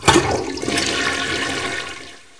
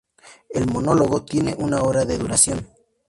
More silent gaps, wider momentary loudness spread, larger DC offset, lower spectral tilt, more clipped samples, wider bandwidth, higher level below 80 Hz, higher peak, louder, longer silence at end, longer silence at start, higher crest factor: neither; first, 11 LU vs 8 LU; neither; second, -3 dB/octave vs -4.5 dB/octave; neither; about the same, 11 kHz vs 11.5 kHz; about the same, -42 dBFS vs -44 dBFS; about the same, 0 dBFS vs -2 dBFS; about the same, -20 LUFS vs -20 LUFS; second, 0.2 s vs 0.4 s; second, 0 s vs 0.25 s; about the same, 20 dB vs 20 dB